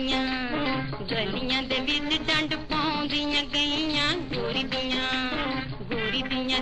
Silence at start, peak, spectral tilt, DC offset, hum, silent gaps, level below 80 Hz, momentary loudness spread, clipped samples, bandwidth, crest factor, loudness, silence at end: 0 s; -10 dBFS; -4 dB/octave; 0.3%; none; none; -44 dBFS; 5 LU; under 0.1%; 9.8 kHz; 16 dB; -26 LUFS; 0 s